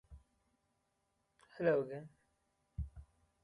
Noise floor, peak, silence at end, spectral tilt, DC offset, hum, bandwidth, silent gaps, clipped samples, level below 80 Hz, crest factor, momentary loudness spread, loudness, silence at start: -82 dBFS; -22 dBFS; 0.4 s; -8.5 dB/octave; under 0.1%; none; 11 kHz; none; under 0.1%; -58 dBFS; 22 dB; 18 LU; -39 LUFS; 0.1 s